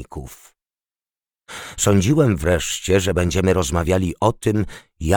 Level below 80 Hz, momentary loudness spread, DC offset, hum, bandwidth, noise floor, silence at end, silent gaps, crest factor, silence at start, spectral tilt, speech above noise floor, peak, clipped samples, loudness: -36 dBFS; 18 LU; under 0.1%; none; 19.5 kHz; under -90 dBFS; 0 s; none; 18 dB; 0 s; -5 dB/octave; over 71 dB; -2 dBFS; under 0.1%; -19 LUFS